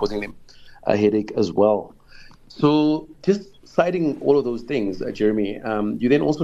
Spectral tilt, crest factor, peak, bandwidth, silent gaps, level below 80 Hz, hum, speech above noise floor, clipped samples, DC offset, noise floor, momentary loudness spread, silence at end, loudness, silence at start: -7.5 dB/octave; 20 dB; -2 dBFS; 7.8 kHz; none; -48 dBFS; none; 24 dB; under 0.1%; under 0.1%; -45 dBFS; 7 LU; 0 s; -21 LUFS; 0 s